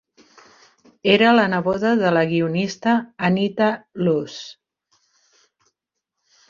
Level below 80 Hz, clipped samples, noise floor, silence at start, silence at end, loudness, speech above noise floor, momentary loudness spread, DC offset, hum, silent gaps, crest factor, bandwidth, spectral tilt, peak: -62 dBFS; under 0.1%; -81 dBFS; 1.05 s; 1.95 s; -19 LUFS; 62 dB; 10 LU; under 0.1%; none; none; 18 dB; 7.4 kHz; -6 dB/octave; -2 dBFS